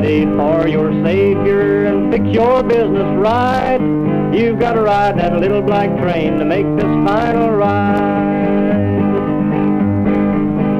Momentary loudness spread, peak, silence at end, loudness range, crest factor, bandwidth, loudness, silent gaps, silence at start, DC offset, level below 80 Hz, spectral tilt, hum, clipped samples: 2 LU; -2 dBFS; 0 s; 1 LU; 12 dB; 7.2 kHz; -14 LUFS; none; 0 s; under 0.1%; -36 dBFS; -9 dB/octave; none; under 0.1%